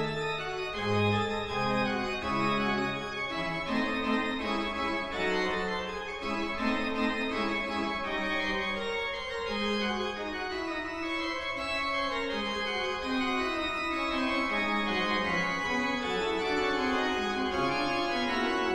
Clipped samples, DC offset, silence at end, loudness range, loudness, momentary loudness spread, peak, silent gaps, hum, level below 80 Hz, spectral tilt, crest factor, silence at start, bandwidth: under 0.1%; under 0.1%; 0 s; 3 LU; -30 LUFS; 5 LU; -16 dBFS; none; none; -52 dBFS; -4.5 dB/octave; 16 dB; 0 s; 13 kHz